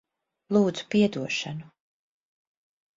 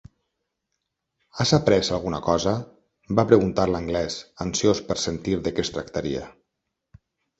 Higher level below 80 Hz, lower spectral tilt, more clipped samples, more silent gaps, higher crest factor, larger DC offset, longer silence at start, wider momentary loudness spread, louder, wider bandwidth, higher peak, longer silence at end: second, -68 dBFS vs -46 dBFS; about the same, -5.5 dB/octave vs -5 dB/octave; neither; neither; about the same, 18 dB vs 22 dB; neither; second, 0.5 s vs 1.35 s; about the same, 10 LU vs 12 LU; about the same, -25 LUFS vs -23 LUFS; about the same, 7.6 kHz vs 8.2 kHz; second, -10 dBFS vs -2 dBFS; first, 1.3 s vs 1.1 s